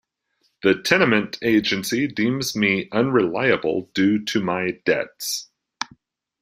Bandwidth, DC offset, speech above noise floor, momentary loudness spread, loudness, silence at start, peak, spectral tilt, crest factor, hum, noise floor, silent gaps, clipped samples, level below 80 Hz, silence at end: 16 kHz; under 0.1%; 49 dB; 9 LU; -21 LUFS; 0.65 s; -2 dBFS; -4.5 dB/octave; 20 dB; none; -69 dBFS; none; under 0.1%; -60 dBFS; 0.55 s